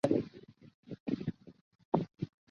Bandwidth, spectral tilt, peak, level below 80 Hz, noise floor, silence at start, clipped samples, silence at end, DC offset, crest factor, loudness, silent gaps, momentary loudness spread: 7.2 kHz; -8 dB/octave; -12 dBFS; -66 dBFS; -55 dBFS; 0.05 s; under 0.1%; 0.25 s; under 0.1%; 26 dB; -38 LUFS; 0.74-0.83 s, 1.00-1.06 s, 1.61-1.71 s, 1.85-1.92 s; 18 LU